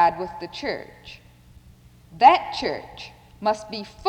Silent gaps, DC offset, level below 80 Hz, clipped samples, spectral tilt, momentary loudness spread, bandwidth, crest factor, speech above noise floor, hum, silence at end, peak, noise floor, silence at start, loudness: none; under 0.1%; -54 dBFS; under 0.1%; -4 dB/octave; 25 LU; 9.8 kHz; 20 dB; 27 dB; none; 0 s; -2 dBFS; -50 dBFS; 0 s; -22 LUFS